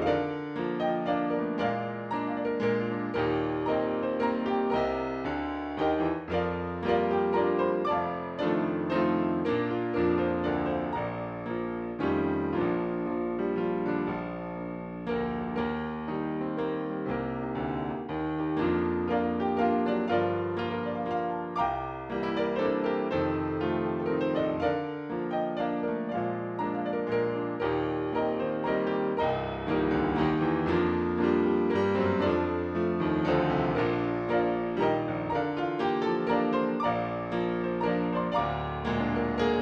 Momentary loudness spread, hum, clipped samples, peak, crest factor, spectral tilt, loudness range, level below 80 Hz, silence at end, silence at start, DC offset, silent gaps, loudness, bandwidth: 6 LU; none; under 0.1%; -14 dBFS; 14 dB; -8.5 dB/octave; 4 LU; -52 dBFS; 0 s; 0 s; under 0.1%; none; -29 LUFS; 7 kHz